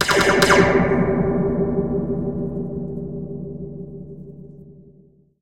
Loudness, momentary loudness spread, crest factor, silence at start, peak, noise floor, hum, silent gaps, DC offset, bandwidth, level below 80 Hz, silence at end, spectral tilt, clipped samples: -19 LUFS; 23 LU; 20 dB; 0 s; -2 dBFS; -53 dBFS; none; none; 0.8%; 16 kHz; -40 dBFS; 0 s; -5 dB/octave; under 0.1%